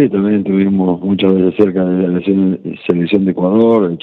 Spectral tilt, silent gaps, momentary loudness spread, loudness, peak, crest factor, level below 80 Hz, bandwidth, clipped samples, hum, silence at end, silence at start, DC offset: -10.5 dB/octave; none; 4 LU; -13 LUFS; 0 dBFS; 12 dB; -54 dBFS; 4.2 kHz; under 0.1%; none; 0.05 s; 0 s; under 0.1%